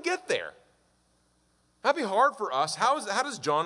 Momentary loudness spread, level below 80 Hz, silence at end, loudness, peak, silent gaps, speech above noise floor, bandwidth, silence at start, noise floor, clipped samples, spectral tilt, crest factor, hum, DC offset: 7 LU; -76 dBFS; 0 s; -27 LUFS; -10 dBFS; none; 41 dB; 11.5 kHz; 0 s; -68 dBFS; under 0.1%; -2.5 dB/octave; 20 dB; none; under 0.1%